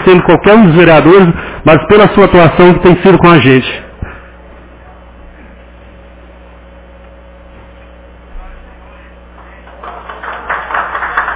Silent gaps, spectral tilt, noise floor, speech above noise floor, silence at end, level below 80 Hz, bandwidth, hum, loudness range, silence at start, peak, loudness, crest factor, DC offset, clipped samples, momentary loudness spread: none; -11 dB/octave; -34 dBFS; 30 dB; 0 s; -30 dBFS; 4 kHz; 60 Hz at -35 dBFS; 21 LU; 0 s; 0 dBFS; -6 LUFS; 10 dB; under 0.1%; 3%; 22 LU